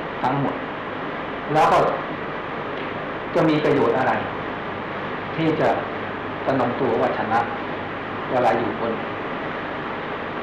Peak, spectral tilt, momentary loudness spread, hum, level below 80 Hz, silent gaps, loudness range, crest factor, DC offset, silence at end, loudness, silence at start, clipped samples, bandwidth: -10 dBFS; -7 dB/octave; 10 LU; none; -52 dBFS; none; 2 LU; 14 dB; under 0.1%; 0 s; -23 LUFS; 0 s; under 0.1%; 12.5 kHz